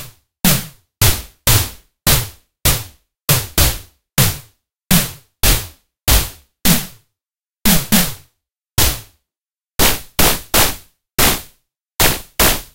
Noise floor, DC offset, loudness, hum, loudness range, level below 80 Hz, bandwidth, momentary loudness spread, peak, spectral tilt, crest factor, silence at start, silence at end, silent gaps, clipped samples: under -90 dBFS; under 0.1%; -15 LUFS; none; 2 LU; -26 dBFS; 17.5 kHz; 13 LU; 0 dBFS; -3 dB/octave; 18 dB; 0 s; 0.1 s; none; under 0.1%